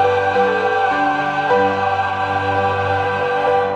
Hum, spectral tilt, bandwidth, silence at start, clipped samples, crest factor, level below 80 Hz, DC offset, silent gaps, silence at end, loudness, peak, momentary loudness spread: none; -6 dB/octave; 9 kHz; 0 s; under 0.1%; 14 dB; -54 dBFS; under 0.1%; none; 0 s; -17 LUFS; -4 dBFS; 3 LU